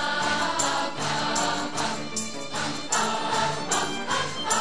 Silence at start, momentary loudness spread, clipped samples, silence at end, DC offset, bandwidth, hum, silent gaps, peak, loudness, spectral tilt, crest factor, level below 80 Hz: 0 s; 5 LU; under 0.1%; 0 s; 1%; 10.5 kHz; none; none; -10 dBFS; -26 LUFS; -2 dB/octave; 16 dB; -60 dBFS